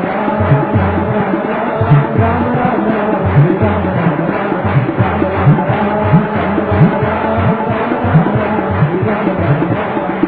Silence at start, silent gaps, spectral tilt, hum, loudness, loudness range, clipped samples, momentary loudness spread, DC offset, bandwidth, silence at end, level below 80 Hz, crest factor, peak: 0 s; none; -12 dB/octave; none; -13 LUFS; 1 LU; under 0.1%; 4 LU; under 0.1%; 4.6 kHz; 0 s; -36 dBFS; 12 dB; 0 dBFS